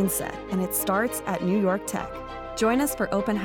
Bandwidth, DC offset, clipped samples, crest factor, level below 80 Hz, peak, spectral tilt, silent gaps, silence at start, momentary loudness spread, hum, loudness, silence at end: 19 kHz; under 0.1%; under 0.1%; 14 dB; -48 dBFS; -12 dBFS; -5 dB/octave; none; 0 s; 9 LU; none; -26 LUFS; 0 s